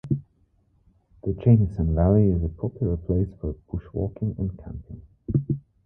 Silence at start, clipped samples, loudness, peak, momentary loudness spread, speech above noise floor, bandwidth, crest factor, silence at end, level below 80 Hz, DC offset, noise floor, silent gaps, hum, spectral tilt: 0.05 s; under 0.1%; -25 LUFS; -6 dBFS; 17 LU; 41 dB; 3.1 kHz; 20 dB; 0.25 s; -36 dBFS; under 0.1%; -64 dBFS; none; none; -13 dB/octave